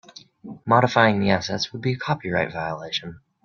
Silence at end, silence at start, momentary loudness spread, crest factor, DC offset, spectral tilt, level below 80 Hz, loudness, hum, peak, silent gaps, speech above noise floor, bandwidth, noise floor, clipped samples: 0.25 s; 0.45 s; 18 LU; 22 dB; under 0.1%; -5.5 dB/octave; -58 dBFS; -22 LUFS; none; -2 dBFS; none; 20 dB; 7.2 kHz; -42 dBFS; under 0.1%